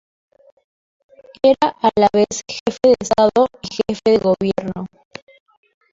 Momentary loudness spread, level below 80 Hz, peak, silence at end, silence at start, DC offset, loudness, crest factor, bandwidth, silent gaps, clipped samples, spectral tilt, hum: 10 LU; -52 dBFS; -2 dBFS; 1.05 s; 1.45 s; under 0.1%; -17 LUFS; 16 dB; 7.8 kHz; 2.60-2.66 s; under 0.1%; -5 dB/octave; none